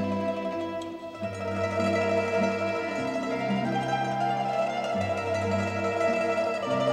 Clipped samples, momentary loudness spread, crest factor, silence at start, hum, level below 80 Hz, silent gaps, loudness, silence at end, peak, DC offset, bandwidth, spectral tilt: under 0.1%; 7 LU; 14 dB; 0 s; none; -64 dBFS; none; -28 LUFS; 0 s; -14 dBFS; under 0.1%; 12 kHz; -6 dB/octave